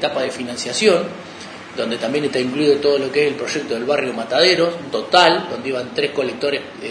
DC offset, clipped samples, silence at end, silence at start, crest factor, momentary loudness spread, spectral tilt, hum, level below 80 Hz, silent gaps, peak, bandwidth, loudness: under 0.1%; under 0.1%; 0 s; 0 s; 18 dB; 11 LU; -3.5 dB/octave; none; -64 dBFS; none; 0 dBFS; 10.5 kHz; -18 LUFS